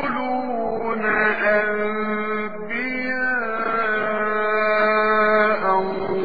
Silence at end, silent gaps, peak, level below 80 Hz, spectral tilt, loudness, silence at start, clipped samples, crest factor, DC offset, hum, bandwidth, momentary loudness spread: 0 s; none; -6 dBFS; -52 dBFS; -8 dB/octave; -21 LUFS; 0 s; under 0.1%; 16 dB; 2%; none; 5 kHz; 7 LU